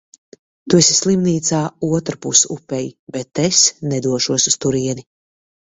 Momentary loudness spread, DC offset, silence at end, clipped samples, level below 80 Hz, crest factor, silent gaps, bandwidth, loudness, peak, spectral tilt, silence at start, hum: 13 LU; under 0.1%; 0.75 s; under 0.1%; -54 dBFS; 18 dB; 2.99-3.07 s; 8.4 kHz; -16 LUFS; 0 dBFS; -3.5 dB/octave; 0.65 s; none